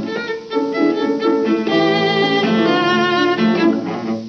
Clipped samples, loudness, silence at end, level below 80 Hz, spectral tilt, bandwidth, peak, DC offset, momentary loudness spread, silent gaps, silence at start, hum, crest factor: under 0.1%; -16 LUFS; 0 s; -68 dBFS; -6 dB/octave; 6.8 kHz; -2 dBFS; under 0.1%; 7 LU; none; 0 s; none; 14 dB